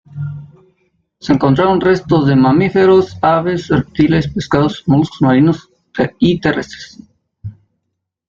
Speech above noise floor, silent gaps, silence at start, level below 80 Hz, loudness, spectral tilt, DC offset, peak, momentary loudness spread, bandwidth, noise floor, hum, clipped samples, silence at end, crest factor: 61 dB; none; 0.15 s; -42 dBFS; -13 LUFS; -7.5 dB/octave; under 0.1%; -2 dBFS; 19 LU; 7.4 kHz; -73 dBFS; none; under 0.1%; 0.8 s; 12 dB